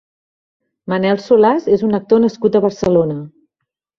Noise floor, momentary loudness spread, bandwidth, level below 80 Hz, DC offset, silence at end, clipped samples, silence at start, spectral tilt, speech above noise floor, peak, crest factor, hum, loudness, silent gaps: -78 dBFS; 10 LU; 7.2 kHz; -52 dBFS; under 0.1%; 0.7 s; under 0.1%; 0.85 s; -7.5 dB/octave; 64 dB; 0 dBFS; 16 dB; none; -15 LUFS; none